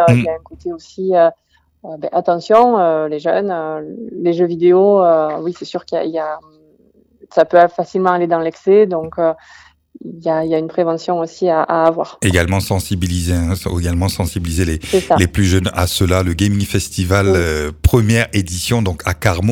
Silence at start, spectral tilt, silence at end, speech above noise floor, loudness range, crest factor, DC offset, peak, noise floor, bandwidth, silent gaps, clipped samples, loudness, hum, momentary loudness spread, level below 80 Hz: 0 s; -6 dB/octave; 0 s; 37 dB; 2 LU; 16 dB; under 0.1%; 0 dBFS; -52 dBFS; 18 kHz; none; under 0.1%; -15 LUFS; none; 11 LU; -32 dBFS